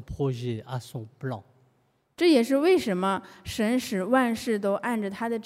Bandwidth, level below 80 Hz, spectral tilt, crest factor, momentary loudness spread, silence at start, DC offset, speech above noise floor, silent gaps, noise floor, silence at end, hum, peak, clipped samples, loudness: 16 kHz; -56 dBFS; -6 dB/octave; 16 dB; 14 LU; 0 s; under 0.1%; 43 dB; none; -68 dBFS; 0.05 s; none; -10 dBFS; under 0.1%; -26 LUFS